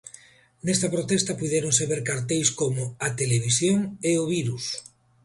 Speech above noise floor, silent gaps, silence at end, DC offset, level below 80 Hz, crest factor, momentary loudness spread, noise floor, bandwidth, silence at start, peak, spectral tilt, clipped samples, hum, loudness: 27 dB; none; 0.4 s; under 0.1%; -58 dBFS; 18 dB; 8 LU; -52 dBFS; 11.5 kHz; 0.05 s; -6 dBFS; -4 dB/octave; under 0.1%; none; -24 LUFS